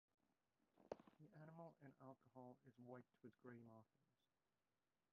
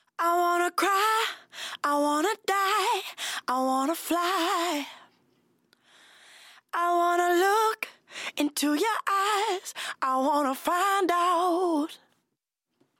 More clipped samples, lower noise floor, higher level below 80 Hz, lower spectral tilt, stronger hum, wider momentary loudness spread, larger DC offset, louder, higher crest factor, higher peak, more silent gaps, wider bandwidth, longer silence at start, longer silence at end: neither; first, under -90 dBFS vs -82 dBFS; second, under -90 dBFS vs -80 dBFS; first, -5 dB/octave vs -0.5 dB/octave; neither; second, 6 LU vs 10 LU; neither; second, -64 LUFS vs -26 LUFS; first, 30 dB vs 14 dB; second, -36 dBFS vs -12 dBFS; neither; second, 3.9 kHz vs 17 kHz; first, 0.6 s vs 0.2 s; about the same, 1.1 s vs 1.05 s